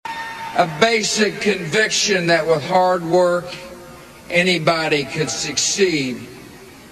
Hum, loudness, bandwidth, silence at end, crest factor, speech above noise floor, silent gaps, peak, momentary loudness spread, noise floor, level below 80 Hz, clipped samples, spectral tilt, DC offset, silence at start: none; -17 LUFS; 13.5 kHz; 0 s; 18 dB; 22 dB; none; 0 dBFS; 12 LU; -40 dBFS; -54 dBFS; under 0.1%; -3 dB/octave; under 0.1%; 0.05 s